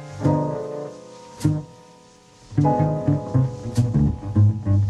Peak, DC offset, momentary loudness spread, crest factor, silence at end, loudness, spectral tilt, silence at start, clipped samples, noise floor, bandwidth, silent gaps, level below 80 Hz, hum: -6 dBFS; under 0.1%; 14 LU; 14 dB; 0 s; -22 LUFS; -9 dB/octave; 0 s; under 0.1%; -50 dBFS; 11.5 kHz; none; -40 dBFS; none